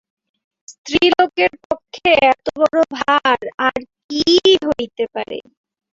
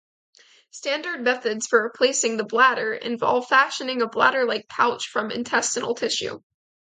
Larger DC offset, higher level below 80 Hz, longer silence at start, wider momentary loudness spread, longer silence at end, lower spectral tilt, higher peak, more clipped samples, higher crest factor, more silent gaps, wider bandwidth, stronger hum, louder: neither; first, -52 dBFS vs -72 dBFS; about the same, 0.7 s vs 0.75 s; first, 13 LU vs 8 LU; about the same, 0.55 s vs 0.5 s; first, -3.5 dB/octave vs -1.5 dB/octave; about the same, -2 dBFS vs -2 dBFS; neither; about the same, 16 dB vs 20 dB; first, 0.78-0.84 s, 1.65-1.70 s, 3.54-3.58 s, 4.04-4.09 s vs none; second, 7.8 kHz vs 9.6 kHz; neither; first, -16 LUFS vs -22 LUFS